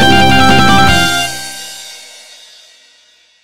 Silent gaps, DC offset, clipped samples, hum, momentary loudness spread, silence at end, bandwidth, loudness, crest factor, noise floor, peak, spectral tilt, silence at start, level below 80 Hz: none; under 0.1%; under 0.1%; none; 21 LU; 0 s; 17 kHz; -8 LUFS; 12 dB; -48 dBFS; 0 dBFS; -3.5 dB/octave; 0 s; -30 dBFS